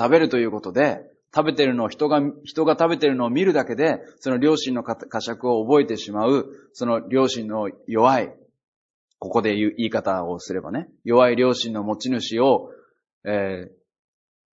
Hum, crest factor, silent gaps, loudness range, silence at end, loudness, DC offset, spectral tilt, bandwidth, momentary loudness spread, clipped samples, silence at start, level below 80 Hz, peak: none; 20 dB; 8.68-9.08 s, 13.13-13.21 s; 3 LU; 0.9 s; -22 LUFS; under 0.1%; -5.5 dB/octave; 8 kHz; 10 LU; under 0.1%; 0 s; -66 dBFS; -2 dBFS